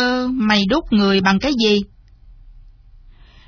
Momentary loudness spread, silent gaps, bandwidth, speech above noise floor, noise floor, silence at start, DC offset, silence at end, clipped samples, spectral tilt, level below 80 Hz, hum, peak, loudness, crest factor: 4 LU; none; 5.4 kHz; 28 dB; -44 dBFS; 0 s; under 0.1%; 0.95 s; under 0.1%; -5.5 dB/octave; -40 dBFS; none; -2 dBFS; -16 LUFS; 18 dB